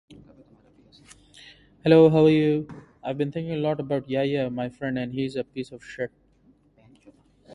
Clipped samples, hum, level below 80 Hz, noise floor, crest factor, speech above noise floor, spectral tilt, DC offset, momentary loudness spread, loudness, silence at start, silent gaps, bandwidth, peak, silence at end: under 0.1%; none; -60 dBFS; -60 dBFS; 22 dB; 37 dB; -8 dB/octave; under 0.1%; 18 LU; -24 LUFS; 0.1 s; none; 10.5 kHz; -4 dBFS; 0 s